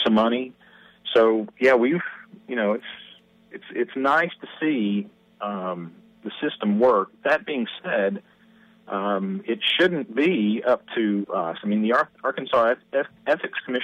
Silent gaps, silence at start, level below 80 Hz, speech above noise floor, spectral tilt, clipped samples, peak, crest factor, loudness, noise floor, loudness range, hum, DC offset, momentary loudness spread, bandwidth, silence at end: none; 0 s; -70 dBFS; 32 dB; -6.5 dB/octave; under 0.1%; -8 dBFS; 16 dB; -23 LUFS; -55 dBFS; 3 LU; none; under 0.1%; 15 LU; 8.2 kHz; 0 s